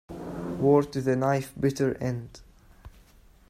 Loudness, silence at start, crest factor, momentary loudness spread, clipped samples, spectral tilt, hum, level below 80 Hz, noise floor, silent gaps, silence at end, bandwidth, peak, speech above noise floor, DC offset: -27 LUFS; 0.1 s; 20 dB; 14 LU; under 0.1%; -7.5 dB/octave; none; -54 dBFS; -56 dBFS; none; 0.6 s; 15.5 kHz; -8 dBFS; 30 dB; under 0.1%